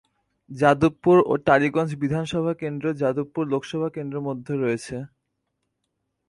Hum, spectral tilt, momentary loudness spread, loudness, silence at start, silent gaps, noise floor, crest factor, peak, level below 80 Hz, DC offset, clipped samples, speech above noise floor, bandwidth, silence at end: none; -7 dB/octave; 12 LU; -23 LUFS; 0.5 s; none; -77 dBFS; 20 dB; -4 dBFS; -56 dBFS; under 0.1%; under 0.1%; 55 dB; 11.5 kHz; 1.2 s